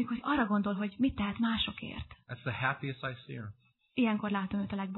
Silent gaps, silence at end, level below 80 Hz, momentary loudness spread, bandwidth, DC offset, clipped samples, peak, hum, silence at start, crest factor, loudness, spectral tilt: none; 0 s; -56 dBFS; 14 LU; 4.2 kHz; under 0.1%; under 0.1%; -16 dBFS; none; 0 s; 18 dB; -33 LUFS; -9 dB/octave